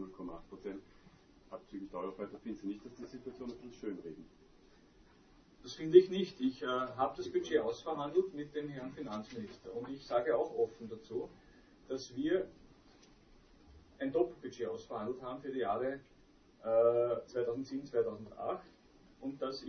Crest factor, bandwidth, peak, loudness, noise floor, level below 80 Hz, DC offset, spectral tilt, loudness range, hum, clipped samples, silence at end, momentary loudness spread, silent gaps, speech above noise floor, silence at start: 26 dB; 6.4 kHz; -10 dBFS; -37 LUFS; -64 dBFS; -68 dBFS; under 0.1%; -5 dB/octave; 13 LU; none; under 0.1%; 0 s; 15 LU; none; 28 dB; 0 s